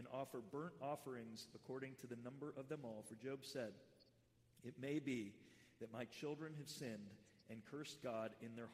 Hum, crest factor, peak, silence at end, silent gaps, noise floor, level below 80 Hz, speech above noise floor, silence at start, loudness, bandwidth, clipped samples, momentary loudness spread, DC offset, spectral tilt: none; 18 dB; -34 dBFS; 0 s; none; -76 dBFS; -86 dBFS; 25 dB; 0 s; -51 LUFS; 15.5 kHz; under 0.1%; 11 LU; under 0.1%; -5.5 dB/octave